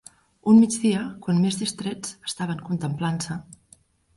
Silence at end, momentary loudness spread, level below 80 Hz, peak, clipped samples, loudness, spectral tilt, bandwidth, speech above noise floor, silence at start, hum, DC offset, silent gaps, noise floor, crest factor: 0.75 s; 15 LU; -60 dBFS; -6 dBFS; under 0.1%; -23 LUFS; -5.5 dB/octave; 11.5 kHz; 35 dB; 0.45 s; none; under 0.1%; none; -57 dBFS; 18 dB